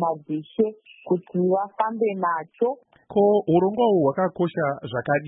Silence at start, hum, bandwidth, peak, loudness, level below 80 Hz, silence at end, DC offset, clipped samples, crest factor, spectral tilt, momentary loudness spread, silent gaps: 0 s; none; 4 kHz; -8 dBFS; -23 LUFS; -66 dBFS; 0 s; under 0.1%; under 0.1%; 16 dB; -12 dB/octave; 8 LU; none